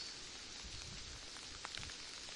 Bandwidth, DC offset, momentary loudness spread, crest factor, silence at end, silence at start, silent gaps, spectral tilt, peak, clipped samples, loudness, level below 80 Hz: 11.5 kHz; under 0.1%; 3 LU; 24 dB; 0 s; 0 s; none; -1 dB/octave; -26 dBFS; under 0.1%; -48 LUFS; -62 dBFS